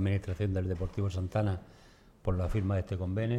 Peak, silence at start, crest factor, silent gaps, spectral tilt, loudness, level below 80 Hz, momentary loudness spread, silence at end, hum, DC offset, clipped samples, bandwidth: -18 dBFS; 0 s; 14 dB; none; -8.5 dB/octave; -33 LUFS; -46 dBFS; 3 LU; 0 s; none; under 0.1%; under 0.1%; 8.6 kHz